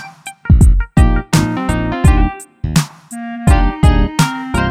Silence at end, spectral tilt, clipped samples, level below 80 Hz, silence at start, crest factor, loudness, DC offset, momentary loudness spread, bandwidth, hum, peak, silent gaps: 0 s; -6 dB/octave; under 0.1%; -16 dBFS; 0 s; 12 dB; -14 LUFS; under 0.1%; 14 LU; 15.5 kHz; none; 0 dBFS; none